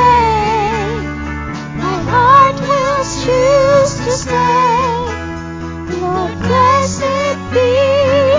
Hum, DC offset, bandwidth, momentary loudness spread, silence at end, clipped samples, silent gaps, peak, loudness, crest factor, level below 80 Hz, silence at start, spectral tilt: none; under 0.1%; 7.6 kHz; 13 LU; 0 s; under 0.1%; none; 0 dBFS; -13 LUFS; 12 dB; -30 dBFS; 0 s; -5 dB/octave